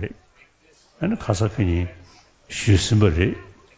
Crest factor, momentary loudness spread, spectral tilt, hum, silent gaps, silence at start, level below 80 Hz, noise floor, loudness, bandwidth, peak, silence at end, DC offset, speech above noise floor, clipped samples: 20 dB; 15 LU; -6 dB/octave; none; none; 0 s; -34 dBFS; -57 dBFS; -22 LUFS; 8 kHz; -4 dBFS; 0.25 s; under 0.1%; 37 dB; under 0.1%